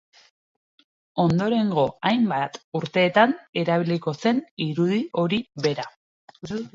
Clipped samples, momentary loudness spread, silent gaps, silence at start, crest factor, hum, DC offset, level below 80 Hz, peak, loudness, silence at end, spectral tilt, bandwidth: under 0.1%; 12 LU; 2.64-2.72 s, 3.49-3.53 s, 4.51-4.57 s, 5.96-6.28 s; 1.15 s; 20 dB; none; under 0.1%; -62 dBFS; -4 dBFS; -23 LUFS; 0.05 s; -6.5 dB/octave; 7.6 kHz